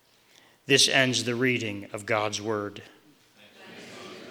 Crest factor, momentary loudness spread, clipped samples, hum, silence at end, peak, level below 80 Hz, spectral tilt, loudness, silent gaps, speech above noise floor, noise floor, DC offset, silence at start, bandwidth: 24 dB; 25 LU; under 0.1%; none; 0 s; -4 dBFS; -76 dBFS; -2.5 dB/octave; -24 LUFS; none; 33 dB; -59 dBFS; under 0.1%; 0.7 s; 20 kHz